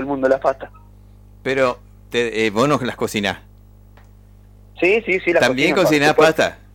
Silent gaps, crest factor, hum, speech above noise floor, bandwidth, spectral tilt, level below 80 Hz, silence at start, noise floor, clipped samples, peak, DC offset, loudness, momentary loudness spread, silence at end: none; 18 dB; 50 Hz at -45 dBFS; 28 dB; 16.5 kHz; -4.5 dB/octave; -46 dBFS; 0 s; -45 dBFS; under 0.1%; 0 dBFS; under 0.1%; -17 LUFS; 11 LU; 0.2 s